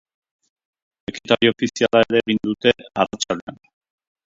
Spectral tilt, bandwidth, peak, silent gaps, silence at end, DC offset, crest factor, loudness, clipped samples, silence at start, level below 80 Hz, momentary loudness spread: -4 dB/octave; 7.8 kHz; 0 dBFS; 3.42-3.47 s; 0.8 s; under 0.1%; 22 dB; -19 LUFS; under 0.1%; 1.1 s; -56 dBFS; 16 LU